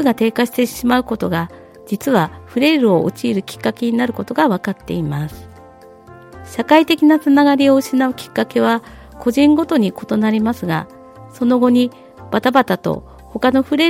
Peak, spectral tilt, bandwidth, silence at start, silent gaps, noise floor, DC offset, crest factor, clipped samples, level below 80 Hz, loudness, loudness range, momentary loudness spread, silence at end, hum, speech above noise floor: 0 dBFS; -6 dB/octave; 16.5 kHz; 0 s; none; -41 dBFS; under 0.1%; 16 dB; under 0.1%; -48 dBFS; -16 LUFS; 4 LU; 11 LU; 0 s; none; 26 dB